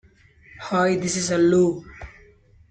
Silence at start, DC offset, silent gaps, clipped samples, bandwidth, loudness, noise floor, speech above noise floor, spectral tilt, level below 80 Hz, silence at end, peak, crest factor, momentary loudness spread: 0.55 s; under 0.1%; none; under 0.1%; 9.4 kHz; -21 LUFS; -53 dBFS; 33 dB; -5 dB/octave; -52 dBFS; 0.6 s; -8 dBFS; 14 dB; 24 LU